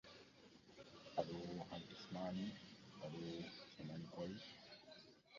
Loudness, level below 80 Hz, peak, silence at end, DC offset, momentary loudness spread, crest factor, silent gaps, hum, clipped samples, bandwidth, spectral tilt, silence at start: -51 LUFS; -78 dBFS; -26 dBFS; 0 s; under 0.1%; 16 LU; 26 dB; none; none; under 0.1%; 7.2 kHz; -5 dB/octave; 0.05 s